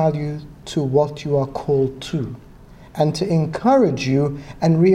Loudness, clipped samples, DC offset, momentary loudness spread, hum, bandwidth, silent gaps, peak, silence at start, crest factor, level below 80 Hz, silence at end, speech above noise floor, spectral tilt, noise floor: -20 LUFS; under 0.1%; under 0.1%; 12 LU; none; 10.5 kHz; none; -4 dBFS; 0 s; 14 dB; -46 dBFS; 0 s; 24 dB; -7.5 dB/octave; -42 dBFS